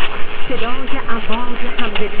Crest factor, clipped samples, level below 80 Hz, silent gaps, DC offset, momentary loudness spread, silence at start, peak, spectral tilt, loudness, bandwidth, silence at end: 8 dB; under 0.1%; -24 dBFS; none; under 0.1%; 3 LU; 0 s; 0 dBFS; -8 dB/octave; -23 LUFS; 4.1 kHz; 0 s